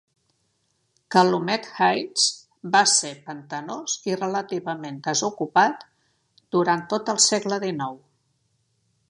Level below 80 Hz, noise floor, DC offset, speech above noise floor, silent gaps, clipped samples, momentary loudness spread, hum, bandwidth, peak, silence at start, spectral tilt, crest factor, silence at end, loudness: -74 dBFS; -71 dBFS; under 0.1%; 48 dB; none; under 0.1%; 14 LU; none; 11.5 kHz; -2 dBFS; 1.1 s; -2.5 dB/octave; 22 dB; 1.15 s; -22 LUFS